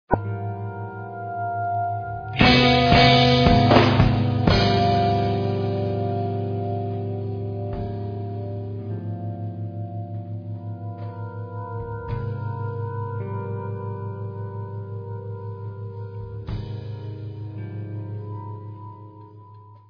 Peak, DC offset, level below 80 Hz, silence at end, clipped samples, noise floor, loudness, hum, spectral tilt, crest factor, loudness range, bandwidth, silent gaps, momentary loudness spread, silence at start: -2 dBFS; under 0.1%; -38 dBFS; 0.1 s; under 0.1%; -46 dBFS; -23 LUFS; none; -7 dB/octave; 22 dB; 17 LU; 5.4 kHz; none; 19 LU; 0.1 s